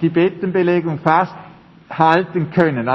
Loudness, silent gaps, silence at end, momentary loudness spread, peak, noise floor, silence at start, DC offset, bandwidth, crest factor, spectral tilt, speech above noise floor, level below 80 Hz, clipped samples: -17 LUFS; none; 0 s; 5 LU; 0 dBFS; -36 dBFS; 0 s; under 0.1%; 6 kHz; 16 dB; -8.5 dB/octave; 20 dB; -56 dBFS; under 0.1%